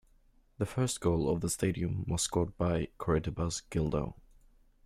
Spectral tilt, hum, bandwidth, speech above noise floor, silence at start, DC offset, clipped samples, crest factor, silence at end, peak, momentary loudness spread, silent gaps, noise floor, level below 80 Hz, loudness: -5.5 dB/octave; none; 15.5 kHz; 33 dB; 0.6 s; under 0.1%; under 0.1%; 16 dB; 0.7 s; -18 dBFS; 5 LU; none; -65 dBFS; -48 dBFS; -33 LUFS